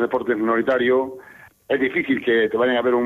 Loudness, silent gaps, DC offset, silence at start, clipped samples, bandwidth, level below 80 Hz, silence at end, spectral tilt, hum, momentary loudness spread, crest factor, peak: -20 LUFS; none; under 0.1%; 0 s; under 0.1%; 4.1 kHz; -60 dBFS; 0 s; -6.5 dB/octave; none; 6 LU; 12 dB; -8 dBFS